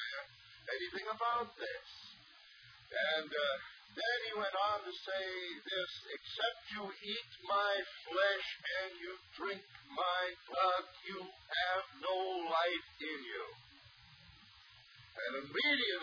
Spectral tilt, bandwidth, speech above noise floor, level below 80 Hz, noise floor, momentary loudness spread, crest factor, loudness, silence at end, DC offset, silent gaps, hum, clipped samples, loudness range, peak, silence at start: 1 dB/octave; 5.4 kHz; 22 dB; -76 dBFS; -61 dBFS; 23 LU; 18 dB; -38 LUFS; 0 s; under 0.1%; none; none; under 0.1%; 3 LU; -22 dBFS; 0 s